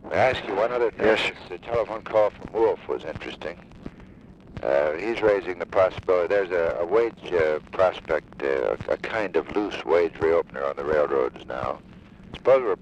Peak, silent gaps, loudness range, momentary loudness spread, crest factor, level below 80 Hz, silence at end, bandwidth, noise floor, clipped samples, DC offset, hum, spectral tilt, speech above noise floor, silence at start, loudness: -8 dBFS; none; 4 LU; 12 LU; 16 dB; -52 dBFS; 0.05 s; 9.2 kHz; -47 dBFS; under 0.1%; under 0.1%; none; -6 dB/octave; 23 dB; 0.05 s; -24 LUFS